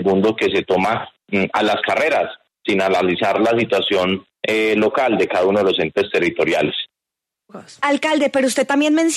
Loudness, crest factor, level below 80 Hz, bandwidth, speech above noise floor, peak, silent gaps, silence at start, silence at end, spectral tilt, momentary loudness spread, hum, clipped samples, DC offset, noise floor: -18 LUFS; 12 dB; -58 dBFS; 13.5 kHz; 67 dB; -6 dBFS; none; 0 s; 0 s; -4.5 dB/octave; 6 LU; none; under 0.1%; under 0.1%; -84 dBFS